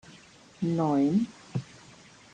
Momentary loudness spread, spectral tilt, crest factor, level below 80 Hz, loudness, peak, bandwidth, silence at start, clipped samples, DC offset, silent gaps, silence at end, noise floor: 13 LU; -8 dB/octave; 14 dB; -66 dBFS; -29 LUFS; -16 dBFS; 9.4 kHz; 0.6 s; under 0.1%; under 0.1%; none; 0.7 s; -54 dBFS